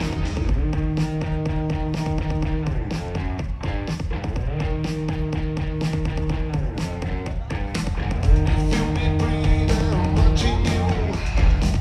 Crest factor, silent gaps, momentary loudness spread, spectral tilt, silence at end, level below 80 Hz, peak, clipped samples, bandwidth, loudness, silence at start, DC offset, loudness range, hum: 16 dB; none; 8 LU; -6.5 dB/octave; 0 s; -24 dBFS; -4 dBFS; under 0.1%; 11.5 kHz; -23 LUFS; 0 s; under 0.1%; 5 LU; none